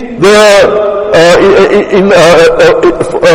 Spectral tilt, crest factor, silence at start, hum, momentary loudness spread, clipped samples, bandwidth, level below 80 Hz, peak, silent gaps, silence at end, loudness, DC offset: -4.5 dB/octave; 4 dB; 0 s; none; 5 LU; 9%; 17 kHz; -32 dBFS; 0 dBFS; none; 0 s; -4 LUFS; under 0.1%